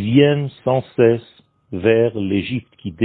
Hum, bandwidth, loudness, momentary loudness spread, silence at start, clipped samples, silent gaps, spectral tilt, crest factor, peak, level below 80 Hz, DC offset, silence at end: none; 4.4 kHz; -18 LUFS; 12 LU; 0 s; under 0.1%; none; -12 dB/octave; 18 dB; 0 dBFS; -54 dBFS; under 0.1%; 0 s